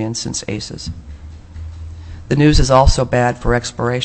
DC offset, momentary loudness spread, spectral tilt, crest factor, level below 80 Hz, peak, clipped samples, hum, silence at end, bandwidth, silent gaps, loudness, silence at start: under 0.1%; 22 LU; -5 dB/octave; 16 dB; -22 dBFS; 0 dBFS; under 0.1%; none; 0 s; 8.6 kHz; none; -16 LUFS; 0 s